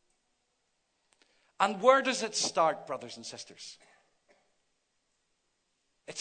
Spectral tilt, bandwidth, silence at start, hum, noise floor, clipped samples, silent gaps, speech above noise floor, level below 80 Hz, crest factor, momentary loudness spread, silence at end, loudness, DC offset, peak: -2 dB/octave; 9.4 kHz; 1.6 s; none; -78 dBFS; under 0.1%; none; 48 dB; -86 dBFS; 26 dB; 21 LU; 0 s; -28 LUFS; under 0.1%; -8 dBFS